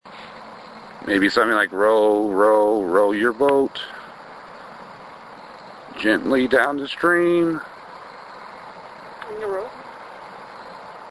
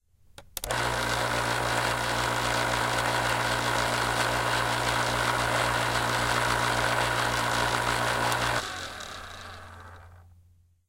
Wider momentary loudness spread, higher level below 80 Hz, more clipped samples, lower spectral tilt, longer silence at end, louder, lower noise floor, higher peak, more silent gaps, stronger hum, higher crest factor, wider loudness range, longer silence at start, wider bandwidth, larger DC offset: first, 22 LU vs 12 LU; second, -60 dBFS vs -46 dBFS; neither; first, -5 dB/octave vs -3 dB/octave; second, 0 s vs 0.65 s; first, -19 LUFS vs -26 LUFS; second, -40 dBFS vs -60 dBFS; first, -2 dBFS vs -10 dBFS; neither; neither; about the same, 20 dB vs 18 dB; first, 10 LU vs 3 LU; second, 0.05 s vs 0.4 s; second, 11 kHz vs 16.5 kHz; neither